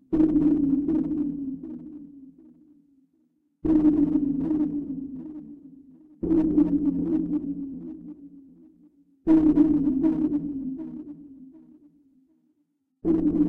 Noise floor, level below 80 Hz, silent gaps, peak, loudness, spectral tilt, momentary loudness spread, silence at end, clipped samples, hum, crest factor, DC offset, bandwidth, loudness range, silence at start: -73 dBFS; -48 dBFS; none; -8 dBFS; -24 LUFS; -11 dB/octave; 21 LU; 0 s; under 0.1%; none; 18 dB; under 0.1%; 2.8 kHz; 5 LU; 0.1 s